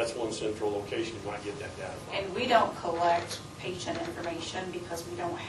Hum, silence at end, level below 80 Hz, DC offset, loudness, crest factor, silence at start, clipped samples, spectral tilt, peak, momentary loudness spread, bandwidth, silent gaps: none; 0 s; -60 dBFS; under 0.1%; -32 LUFS; 22 dB; 0 s; under 0.1%; -4 dB/octave; -10 dBFS; 12 LU; 13 kHz; none